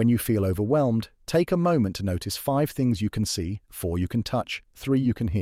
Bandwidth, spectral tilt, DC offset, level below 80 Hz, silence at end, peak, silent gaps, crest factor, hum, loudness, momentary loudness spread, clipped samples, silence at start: 16.5 kHz; -6.5 dB/octave; under 0.1%; -46 dBFS; 0 s; -12 dBFS; none; 14 dB; none; -26 LUFS; 7 LU; under 0.1%; 0 s